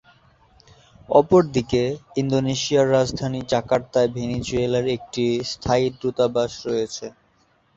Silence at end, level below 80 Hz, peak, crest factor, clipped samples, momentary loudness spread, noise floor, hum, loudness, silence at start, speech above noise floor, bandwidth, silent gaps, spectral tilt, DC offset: 0.65 s; -48 dBFS; -2 dBFS; 20 dB; under 0.1%; 8 LU; -62 dBFS; none; -21 LUFS; 1.1 s; 41 dB; 8 kHz; none; -5.5 dB/octave; under 0.1%